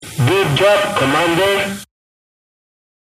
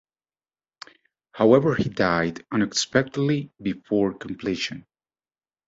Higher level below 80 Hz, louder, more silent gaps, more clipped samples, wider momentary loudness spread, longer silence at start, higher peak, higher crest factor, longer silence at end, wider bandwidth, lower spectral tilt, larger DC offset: first, -48 dBFS vs -56 dBFS; first, -14 LUFS vs -23 LUFS; neither; neither; second, 7 LU vs 12 LU; second, 0 s vs 1.35 s; about the same, -2 dBFS vs -2 dBFS; second, 16 dB vs 22 dB; first, 1.2 s vs 0.9 s; first, 15.5 kHz vs 8 kHz; about the same, -4.5 dB/octave vs -5 dB/octave; neither